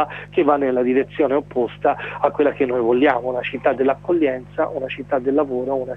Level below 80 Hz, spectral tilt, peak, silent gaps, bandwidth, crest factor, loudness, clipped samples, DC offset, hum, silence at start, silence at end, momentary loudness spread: -52 dBFS; -8 dB/octave; -2 dBFS; none; 5.4 kHz; 16 dB; -20 LUFS; under 0.1%; under 0.1%; 50 Hz at -40 dBFS; 0 s; 0 s; 6 LU